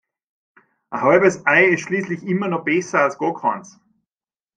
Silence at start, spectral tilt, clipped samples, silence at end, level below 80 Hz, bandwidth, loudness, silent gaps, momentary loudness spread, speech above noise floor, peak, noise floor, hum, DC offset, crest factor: 0.9 s; -5.5 dB/octave; under 0.1%; 0.9 s; -64 dBFS; 9.2 kHz; -18 LUFS; none; 9 LU; over 72 dB; -2 dBFS; under -90 dBFS; none; under 0.1%; 18 dB